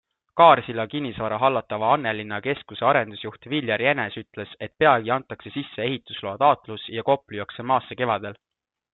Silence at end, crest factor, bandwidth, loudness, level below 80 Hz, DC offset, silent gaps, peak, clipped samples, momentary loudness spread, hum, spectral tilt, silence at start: 0.6 s; 22 dB; 4.2 kHz; -23 LUFS; -64 dBFS; under 0.1%; none; -2 dBFS; under 0.1%; 14 LU; none; -9.5 dB/octave; 0.35 s